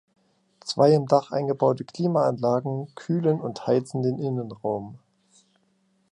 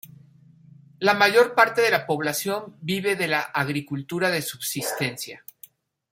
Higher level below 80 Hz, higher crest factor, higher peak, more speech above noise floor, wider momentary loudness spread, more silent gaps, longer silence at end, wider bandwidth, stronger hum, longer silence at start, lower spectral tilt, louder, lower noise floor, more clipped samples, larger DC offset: about the same, -68 dBFS vs -70 dBFS; about the same, 20 dB vs 22 dB; second, -6 dBFS vs -2 dBFS; first, 44 dB vs 29 dB; about the same, 12 LU vs 12 LU; neither; first, 1.15 s vs 0.75 s; second, 11 kHz vs 16.5 kHz; neither; first, 0.65 s vs 0.05 s; first, -7.5 dB/octave vs -3.5 dB/octave; about the same, -24 LUFS vs -23 LUFS; first, -67 dBFS vs -53 dBFS; neither; neither